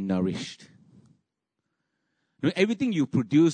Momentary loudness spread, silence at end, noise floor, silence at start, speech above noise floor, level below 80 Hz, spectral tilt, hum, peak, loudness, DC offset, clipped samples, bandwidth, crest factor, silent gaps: 14 LU; 0 s; -82 dBFS; 0 s; 58 dB; -64 dBFS; -6.5 dB/octave; none; -10 dBFS; -26 LUFS; under 0.1%; under 0.1%; 9.6 kHz; 18 dB; none